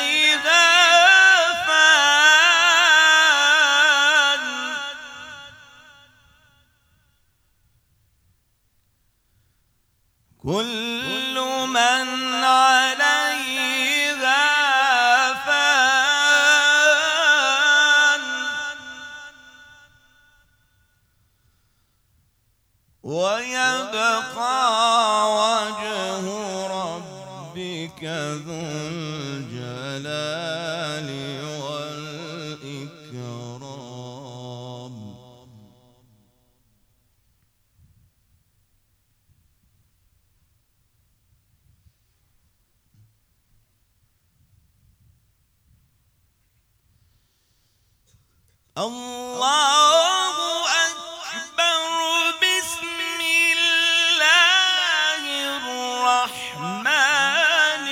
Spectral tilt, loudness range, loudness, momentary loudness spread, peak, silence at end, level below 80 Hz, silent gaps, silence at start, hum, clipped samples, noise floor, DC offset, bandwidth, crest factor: -1 dB/octave; 20 LU; -17 LUFS; 22 LU; -2 dBFS; 0 s; -66 dBFS; none; 0 s; none; under 0.1%; -65 dBFS; under 0.1%; 17 kHz; 20 dB